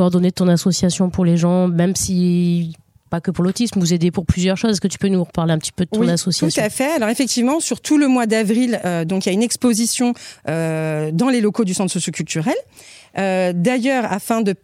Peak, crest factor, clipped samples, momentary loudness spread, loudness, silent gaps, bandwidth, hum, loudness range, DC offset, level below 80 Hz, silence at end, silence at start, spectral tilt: -2 dBFS; 16 dB; under 0.1%; 6 LU; -18 LUFS; none; 15.5 kHz; none; 2 LU; under 0.1%; -44 dBFS; 0.1 s; 0 s; -5 dB/octave